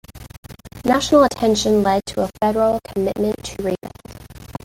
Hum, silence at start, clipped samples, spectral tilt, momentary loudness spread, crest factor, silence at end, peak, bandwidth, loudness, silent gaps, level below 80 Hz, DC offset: none; 0.1 s; under 0.1%; -5 dB/octave; 25 LU; 18 dB; 0.1 s; -2 dBFS; 17 kHz; -19 LUFS; 0.38-0.43 s; -42 dBFS; under 0.1%